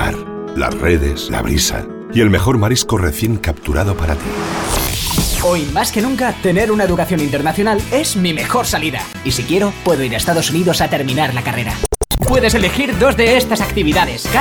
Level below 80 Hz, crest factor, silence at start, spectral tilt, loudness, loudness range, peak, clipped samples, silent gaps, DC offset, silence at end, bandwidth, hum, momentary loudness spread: -26 dBFS; 12 dB; 0 s; -4.5 dB/octave; -15 LUFS; 2 LU; -2 dBFS; under 0.1%; none; under 0.1%; 0 s; over 20 kHz; none; 7 LU